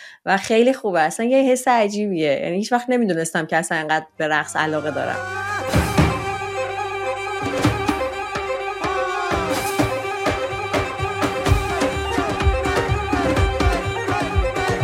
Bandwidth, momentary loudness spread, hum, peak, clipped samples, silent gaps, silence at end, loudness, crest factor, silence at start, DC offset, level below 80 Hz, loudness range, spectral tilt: 16.5 kHz; 7 LU; none; -4 dBFS; under 0.1%; none; 0 s; -21 LUFS; 16 dB; 0 s; under 0.1%; -32 dBFS; 4 LU; -5 dB/octave